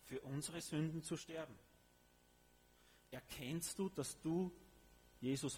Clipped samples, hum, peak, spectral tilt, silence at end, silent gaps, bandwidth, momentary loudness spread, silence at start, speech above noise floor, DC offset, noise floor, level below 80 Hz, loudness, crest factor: under 0.1%; none; -30 dBFS; -5 dB/octave; 0 s; none; over 20 kHz; 13 LU; 0 s; 27 dB; under 0.1%; -72 dBFS; -72 dBFS; -45 LUFS; 16 dB